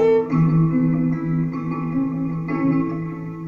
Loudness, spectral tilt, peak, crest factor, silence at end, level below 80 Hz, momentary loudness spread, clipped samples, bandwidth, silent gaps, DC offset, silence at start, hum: -21 LUFS; -11 dB/octave; -8 dBFS; 12 dB; 0 s; -50 dBFS; 8 LU; under 0.1%; 4.8 kHz; none; under 0.1%; 0 s; none